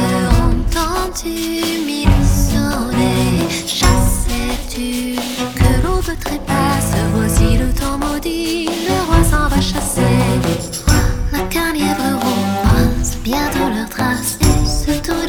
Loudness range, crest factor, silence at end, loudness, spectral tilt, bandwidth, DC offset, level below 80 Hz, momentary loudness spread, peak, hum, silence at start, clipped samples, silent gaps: 1 LU; 14 dB; 0 s; -16 LUFS; -5 dB/octave; 19.5 kHz; under 0.1%; -20 dBFS; 6 LU; 0 dBFS; none; 0 s; under 0.1%; none